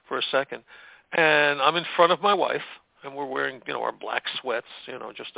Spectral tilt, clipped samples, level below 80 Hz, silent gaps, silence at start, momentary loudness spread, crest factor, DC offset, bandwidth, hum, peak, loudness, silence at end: -7.5 dB/octave; under 0.1%; -74 dBFS; none; 0.1 s; 19 LU; 22 dB; under 0.1%; 4 kHz; none; -4 dBFS; -24 LUFS; 0.05 s